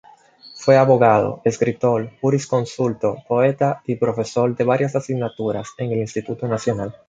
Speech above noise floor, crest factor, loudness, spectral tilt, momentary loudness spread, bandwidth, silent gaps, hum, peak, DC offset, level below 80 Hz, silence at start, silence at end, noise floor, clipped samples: 27 dB; 18 dB; -20 LUFS; -7 dB/octave; 10 LU; 9.2 kHz; none; none; -2 dBFS; under 0.1%; -56 dBFS; 0.45 s; 0.2 s; -46 dBFS; under 0.1%